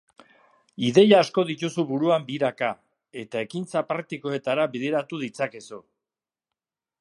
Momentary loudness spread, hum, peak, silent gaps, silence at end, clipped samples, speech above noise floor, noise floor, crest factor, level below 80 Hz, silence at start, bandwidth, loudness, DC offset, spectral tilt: 20 LU; none; -4 dBFS; none; 1.2 s; under 0.1%; over 66 dB; under -90 dBFS; 22 dB; -74 dBFS; 0.8 s; 11.5 kHz; -24 LUFS; under 0.1%; -5.5 dB/octave